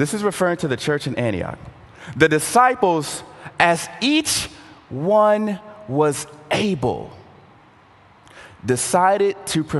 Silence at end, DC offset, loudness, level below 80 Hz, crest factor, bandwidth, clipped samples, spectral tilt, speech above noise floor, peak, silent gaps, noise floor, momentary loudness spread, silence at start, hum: 0 s; under 0.1%; -19 LUFS; -50 dBFS; 20 dB; 13 kHz; under 0.1%; -4 dB/octave; 31 dB; 0 dBFS; none; -50 dBFS; 16 LU; 0 s; none